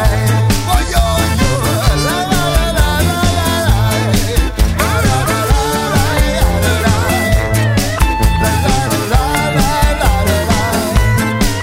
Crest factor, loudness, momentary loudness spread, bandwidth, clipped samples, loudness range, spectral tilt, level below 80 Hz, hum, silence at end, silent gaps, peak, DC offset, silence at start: 12 dB; -13 LUFS; 1 LU; 16.5 kHz; under 0.1%; 0 LU; -4.5 dB/octave; -18 dBFS; none; 0 s; none; 0 dBFS; under 0.1%; 0 s